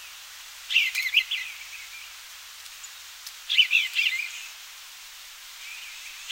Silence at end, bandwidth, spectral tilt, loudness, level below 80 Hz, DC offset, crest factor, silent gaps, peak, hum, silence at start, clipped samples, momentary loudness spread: 0 s; 16 kHz; 5.5 dB/octave; -23 LUFS; -70 dBFS; under 0.1%; 22 dB; none; -8 dBFS; none; 0 s; under 0.1%; 20 LU